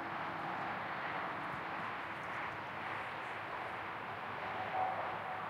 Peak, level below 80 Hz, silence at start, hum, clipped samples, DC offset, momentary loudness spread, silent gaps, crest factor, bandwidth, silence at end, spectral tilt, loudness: -26 dBFS; -74 dBFS; 0 s; none; under 0.1%; under 0.1%; 5 LU; none; 16 dB; 16 kHz; 0 s; -5.5 dB/octave; -41 LUFS